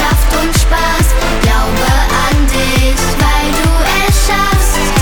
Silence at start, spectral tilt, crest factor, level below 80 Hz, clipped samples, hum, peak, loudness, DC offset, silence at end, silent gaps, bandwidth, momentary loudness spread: 0 s; -4 dB/octave; 10 dB; -12 dBFS; under 0.1%; none; 0 dBFS; -12 LUFS; under 0.1%; 0 s; none; 20 kHz; 1 LU